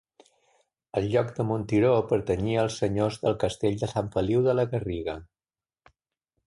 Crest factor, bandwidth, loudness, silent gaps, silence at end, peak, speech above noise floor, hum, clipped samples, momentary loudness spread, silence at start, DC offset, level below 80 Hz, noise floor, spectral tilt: 16 dB; 11.5 kHz; -26 LUFS; none; 1.2 s; -10 dBFS; over 65 dB; none; under 0.1%; 9 LU; 0.95 s; under 0.1%; -50 dBFS; under -90 dBFS; -7 dB/octave